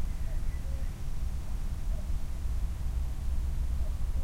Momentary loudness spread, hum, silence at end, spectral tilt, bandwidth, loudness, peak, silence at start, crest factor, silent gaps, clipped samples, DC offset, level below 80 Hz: 3 LU; none; 0 s; -6.5 dB/octave; 15 kHz; -37 LUFS; -20 dBFS; 0 s; 12 dB; none; under 0.1%; under 0.1%; -32 dBFS